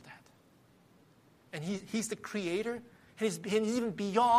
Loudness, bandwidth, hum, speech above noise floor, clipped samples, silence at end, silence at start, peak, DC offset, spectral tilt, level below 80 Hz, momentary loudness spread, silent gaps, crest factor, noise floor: -35 LUFS; 15 kHz; none; 32 dB; under 0.1%; 0 s; 0.05 s; -14 dBFS; under 0.1%; -4.5 dB/octave; -74 dBFS; 16 LU; none; 20 dB; -64 dBFS